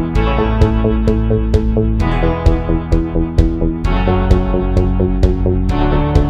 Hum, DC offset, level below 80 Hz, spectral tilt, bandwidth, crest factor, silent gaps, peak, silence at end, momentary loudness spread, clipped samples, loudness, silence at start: none; under 0.1%; -16 dBFS; -8.5 dB/octave; 7.4 kHz; 12 dB; none; 0 dBFS; 0 s; 3 LU; under 0.1%; -15 LUFS; 0 s